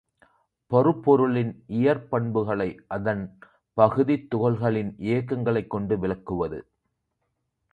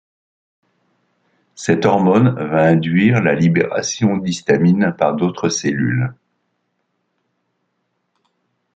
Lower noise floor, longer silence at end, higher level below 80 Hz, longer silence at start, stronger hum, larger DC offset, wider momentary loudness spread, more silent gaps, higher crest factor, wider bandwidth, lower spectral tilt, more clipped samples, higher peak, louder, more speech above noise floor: first, -77 dBFS vs -70 dBFS; second, 1.1 s vs 2.65 s; about the same, -54 dBFS vs -56 dBFS; second, 0.7 s vs 1.6 s; second, none vs 60 Hz at -35 dBFS; neither; first, 9 LU vs 6 LU; neither; first, 22 dB vs 16 dB; second, 4.9 kHz vs 8.8 kHz; first, -10 dB/octave vs -6 dB/octave; neither; about the same, -4 dBFS vs -2 dBFS; second, -25 LUFS vs -16 LUFS; about the same, 54 dB vs 55 dB